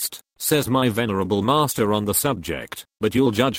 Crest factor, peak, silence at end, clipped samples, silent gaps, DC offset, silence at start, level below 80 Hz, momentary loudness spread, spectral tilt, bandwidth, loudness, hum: 16 dB; -4 dBFS; 0 s; under 0.1%; none; under 0.1%; 0 s; -50 dBFS; 9 LU; -4.5 dB/octave; 17 kHz; -21 LUFS; none